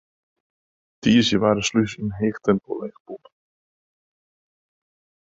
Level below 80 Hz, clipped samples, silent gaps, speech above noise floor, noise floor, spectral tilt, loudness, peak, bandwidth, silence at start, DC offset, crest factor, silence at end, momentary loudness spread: -54 dBFS; under 0.1%; 3.00-3.05 s; over 69 dB; under -90 dBFS; -5 dB/octave; -21 LUFS; -6 dBFS; 7.8 kHz; 1.05 s; under 0.1%; 20 dB; 2.15 s; 21 LU